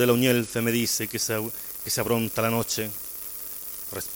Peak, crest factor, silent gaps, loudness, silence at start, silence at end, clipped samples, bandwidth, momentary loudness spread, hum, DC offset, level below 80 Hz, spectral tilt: -8 dBFS; 18 dB; none; -26 LUFS; 0 s; 0 s; under 0.1%; 17 kHz; 10 LU; none; under 0.1%; -58 dBFS; -4 dB/octave